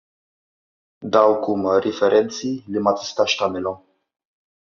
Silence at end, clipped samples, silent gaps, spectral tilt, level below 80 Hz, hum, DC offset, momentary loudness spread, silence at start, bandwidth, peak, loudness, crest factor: 0.9 s; under 0.1%; none; -3 dB/octave; -68 dBFS; none; under 0.1%; 11 LU; 1 s; 7.4 kHz; -2 dBFS; -20 LUFS; 20 dB